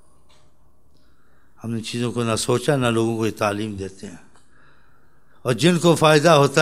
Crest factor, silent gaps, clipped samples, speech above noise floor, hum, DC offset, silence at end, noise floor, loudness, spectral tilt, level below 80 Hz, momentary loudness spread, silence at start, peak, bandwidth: 22 dB; none; under 0.1%; 40 dB; none; 0.5%; 0 s; -59 dBFS; -19 LUFS; -5 dB/octave; -58 dBFS; 18 LU; 1.65 s; 0 dBFS; 15.5 kHz